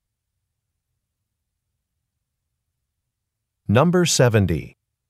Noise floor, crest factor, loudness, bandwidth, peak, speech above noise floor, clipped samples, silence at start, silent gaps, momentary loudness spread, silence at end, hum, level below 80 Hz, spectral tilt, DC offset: -80 dBFS; 22 dB; -18 LUFS; 15.5 kHz; -2 dBFS; 63 dB; under 0.1%; 3.7 s; none; 11 LU; 0.4 s; none; -48 dBFS; -5 dB/octave; under 0.1%